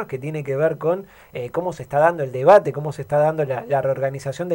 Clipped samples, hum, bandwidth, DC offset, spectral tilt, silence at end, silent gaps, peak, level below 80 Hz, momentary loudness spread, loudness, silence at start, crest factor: under 0.1%; none; 16.5 kHz; under 0.1%; -7 dB/octave; 0 s; none; -2 dBFS; -58 dBFS; 14 LU; -20 LUFS; 0 s; 18 dB